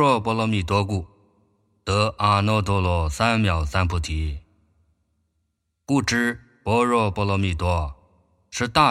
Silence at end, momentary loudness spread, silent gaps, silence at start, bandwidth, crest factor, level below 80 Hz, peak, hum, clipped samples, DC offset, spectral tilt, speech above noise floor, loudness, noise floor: 0 s; 10 LU; none; 0 s; 13.5 kHz; 22 dB; -36 dBFS; -2 dBFS; none; under 0.1%; under 0.1%; -5.5 dB/octave; 53 dB; -22 LUFS; -74 dBFS